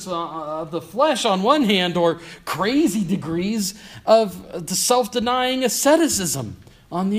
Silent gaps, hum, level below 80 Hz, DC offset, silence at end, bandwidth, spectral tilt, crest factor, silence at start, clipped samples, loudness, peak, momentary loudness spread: none; none; -54 dBFS; under 0.1%; 0 s; 15.5 kHz; -3.5 dB/octave; 18 dB; 0 s; under 0.1%; -20 LUFS; -2 dBFS; 12 LU